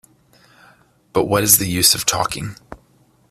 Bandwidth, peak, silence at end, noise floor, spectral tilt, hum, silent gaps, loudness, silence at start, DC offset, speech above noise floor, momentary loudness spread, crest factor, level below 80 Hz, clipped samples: 16 kHz; 0 dBFS; 0.55 s; -56 dBFS; -2.5 dB/octave; none; none; -15 LUFS; 1.15 s; under 0.1%; 39 dB; 13 LU; 20 dB; -48 dBFS; under 0.1%